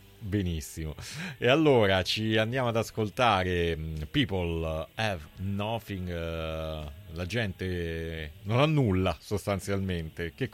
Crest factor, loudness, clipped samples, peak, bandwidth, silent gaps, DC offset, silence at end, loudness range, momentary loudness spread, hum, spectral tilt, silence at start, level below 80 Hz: 18 dB; -29 LUFS; under 0.1%; -10 dBFS; 16.5 kHz; none; under 0.1%; 0.05 s; 7 LU; 13 LU; none; -6 dB/octave; 0.2 s; -46 dBFS